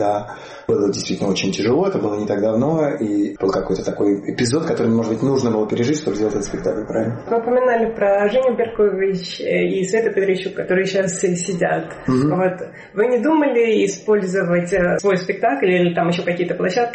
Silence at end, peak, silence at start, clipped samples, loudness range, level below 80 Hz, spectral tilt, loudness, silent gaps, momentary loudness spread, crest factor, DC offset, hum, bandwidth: 0 s; -6 dBFS; 0 s; under 0.1%; 2 LU; -48 dBFS; -5.5 dB/octave; -19 LUFS; none; 6 LU; 12 dB; under 0.1%; none; 8.8 kHz